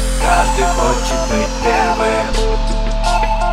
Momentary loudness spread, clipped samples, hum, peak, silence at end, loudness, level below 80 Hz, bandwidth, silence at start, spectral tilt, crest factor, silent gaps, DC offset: 5 LU; under 0.1%; none; 0 dBFS; 0 s; -16 LUFS; -18 dBFS; 14 kHz; 0 s; -4 dB/octave; 14 dB; none; 0.8%